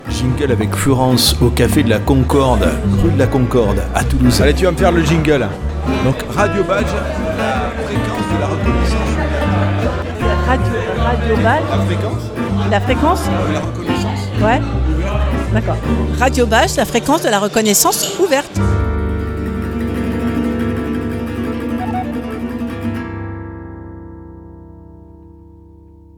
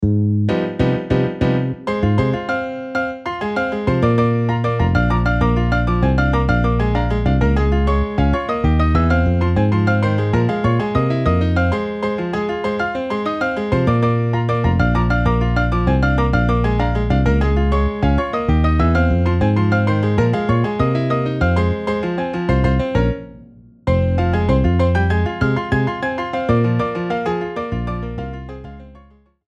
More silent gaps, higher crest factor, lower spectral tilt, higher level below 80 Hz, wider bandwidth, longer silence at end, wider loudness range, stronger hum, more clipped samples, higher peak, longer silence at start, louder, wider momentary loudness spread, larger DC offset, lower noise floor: neither; about the same, 16 dB vs 14 dB; second, -5.5 dB/octave vs -8.5 dB/octave; about the same, -24 dBFS vs -24 dBFS; first, 19 kHz vs 8 kHz; about the same, 0.6 s vs 0.6 s; first, 9 LU vs 3 LU; first, 50 Hz at -35 dBFS vs none; neither; about the same, 0 dBFS vs -2 dBFS; about the same, 0 s vs 0 s; about the same, -16 LUFS vs -18 LUFS; first, 9 LU vs 6 LU; neither; second, -41 dBFS vs -48 dBFS